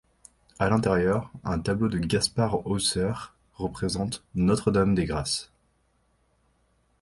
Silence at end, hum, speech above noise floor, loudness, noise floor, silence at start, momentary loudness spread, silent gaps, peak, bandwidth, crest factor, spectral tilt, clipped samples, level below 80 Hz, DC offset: 1.55 s; none; 43 dB; -26 LUFS; -68 dBFS; 0.6 s; 8 LU; none; -8 dBFS; 11.5 kHz; 20 dB; -5 dB/octave; under 0.1%; -46 dBFS; under 0.1%